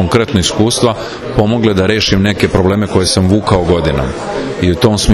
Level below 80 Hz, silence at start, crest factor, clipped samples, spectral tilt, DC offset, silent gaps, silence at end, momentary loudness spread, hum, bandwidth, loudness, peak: -28 dBFS; 0 s; 12 dB; 0.4%; -5 dB/octave; under 0.1%; none; 0 s; 6 LU; none; 13 kHz; -12 LUFS; 0 dBFS